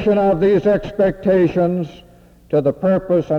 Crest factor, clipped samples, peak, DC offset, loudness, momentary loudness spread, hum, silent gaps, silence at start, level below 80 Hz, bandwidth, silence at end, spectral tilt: 10 dB; under 0.1%; -6 dBFS; under 0.1%; -17 LUFS; 6 LU; none; none; 0 s; -42 dBFS; 6.8 kHz; 0 s; -9 dB/octave